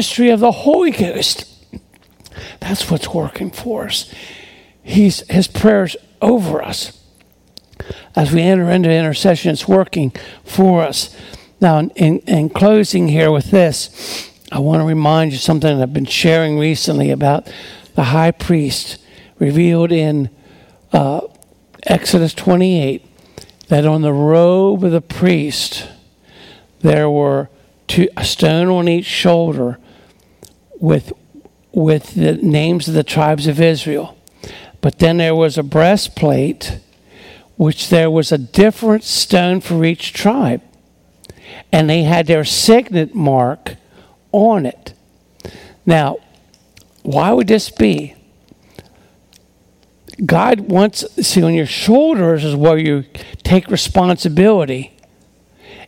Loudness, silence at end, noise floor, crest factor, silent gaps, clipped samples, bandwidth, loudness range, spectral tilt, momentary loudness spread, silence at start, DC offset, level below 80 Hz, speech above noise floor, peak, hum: -14 LUFS; 0 s; -52 dBFS; 14 dB; none; under 0.1%; 16.5 kHz; 4 LU; -6 dB/octave; 14 LU; 0 s; under 0.1%; -42 dBFS; 39 dB; 0 dBFS; none